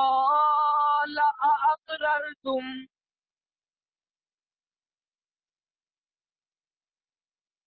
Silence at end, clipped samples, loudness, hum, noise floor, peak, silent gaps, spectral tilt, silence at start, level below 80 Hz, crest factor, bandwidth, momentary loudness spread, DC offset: 4.8 s; under 0.1%; -24 LUFS; none; under -90 dBFS; -14 dBFS; none; -5.5 dB/octave; 0 s; -76 dBFS; 14 dB; 4.8 kHz; 10 LU; under 0.1%